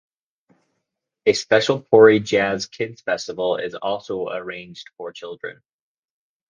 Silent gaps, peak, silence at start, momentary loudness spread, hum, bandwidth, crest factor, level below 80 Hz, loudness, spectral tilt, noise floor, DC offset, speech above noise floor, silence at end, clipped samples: none; 0 dBFS; 1.25 s; 21 LU; none; 7.6 kHz; 22 dB; -62 dBFS; -19 LUFS; -4.5 dB/octave; -78 dBFS; under 0.1%; 58 dB; 0.95 s; under 0.1%